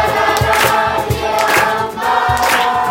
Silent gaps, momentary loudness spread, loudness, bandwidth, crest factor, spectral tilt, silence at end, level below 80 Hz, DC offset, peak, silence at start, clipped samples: none; 4 LU; -13 LUFS; 16.5 kHz; 14 dB; -3.5 dB/octave; 0 s; -36 dBFS; under 0.1%; 0 dBFS; 0 s; under 0.1%